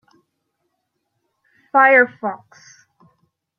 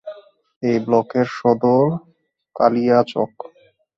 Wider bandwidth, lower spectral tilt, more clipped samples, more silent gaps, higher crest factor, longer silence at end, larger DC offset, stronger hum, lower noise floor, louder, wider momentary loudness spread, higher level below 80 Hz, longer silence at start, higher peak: about the same, 6.8 kHz vs 7.4 kHz; second, -5 dB/octave vs -8 dB/octave; neither; second, none vs 0.56-0.61 s; about the same, 20 dB vs 18 dB; first, 1.25 s vs 0.5 s; neither; neither; first, -74 dBFS vs -54 dBFS; first, -15 LUFS vs -18 LUFS; about the same, 17 LU vs 15 LU; second, -80 dBFS vs -60 dBFS; first, 1.75 s vs 0.05 s; about the same, -2 dBFS vs 0 dBFS